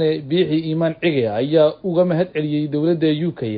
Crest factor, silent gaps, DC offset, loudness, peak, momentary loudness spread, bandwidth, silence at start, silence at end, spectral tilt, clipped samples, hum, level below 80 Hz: 16 dB; none; under 0.1%; -19 LUFS; -2 dBFS; 5 LU; 5 kHz; 0 s; 0 s; -12.5 dB/octave; under 0.1%; none; -58 dBFS